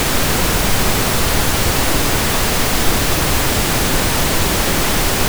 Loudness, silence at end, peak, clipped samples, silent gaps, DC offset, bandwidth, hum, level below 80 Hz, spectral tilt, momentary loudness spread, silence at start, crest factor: -15 LUFS; 0 s; -2 dBFS; under 0.1%; none; under 0.1%; over 20 kHz; none; -22 dBFS; -3 dB/octave; 0 LU; 0 s; 14 dB